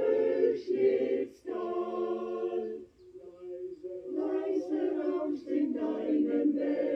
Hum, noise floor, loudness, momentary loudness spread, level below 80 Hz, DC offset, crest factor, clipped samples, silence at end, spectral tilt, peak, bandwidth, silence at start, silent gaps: none; -51 dBFS; -31 LUFS; 14 LU; -74 dBFS; under 0.1%; 16 dB; under 0.1%; 0 s; -7.5 dB/octave; -16 dBFS; 6.2 kHz; 0 s; none